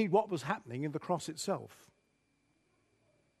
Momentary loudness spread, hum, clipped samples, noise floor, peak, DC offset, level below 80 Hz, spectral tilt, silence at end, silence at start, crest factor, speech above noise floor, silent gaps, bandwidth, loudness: 8 LU; none; under 0.1%; -76 dBFS; -16 dBFS; under 0.1%; -80 dBFS; -5.5 dB/octave; 1.65 s; 0 s; 22 dB; 41 dB; none; 13 kHz; -36 LUFS